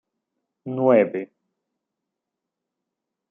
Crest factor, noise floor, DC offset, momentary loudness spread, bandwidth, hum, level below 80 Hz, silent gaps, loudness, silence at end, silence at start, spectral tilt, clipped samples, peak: 22 dB; -84 dBFS; under 0.1%; 22 LU; 3.6 kHz; none; -78 dBFS; none; -20 LUFS; 2.05 s; 0.65 s; -7.5 dB/octave; under 0.1%; -4 dBFS